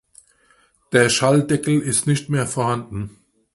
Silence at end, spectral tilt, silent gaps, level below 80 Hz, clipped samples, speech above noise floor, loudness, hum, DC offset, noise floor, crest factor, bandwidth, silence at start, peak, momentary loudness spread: 0.45 s; -4.5 dB/octave; none; -52 dBFS; under 0.1%; 40 dB; -19 LUFS; none; under 0.1%; -59 dBFS; 20 dB; 11.5 kHz; 0.9 s; 0 dBFS; 14 LU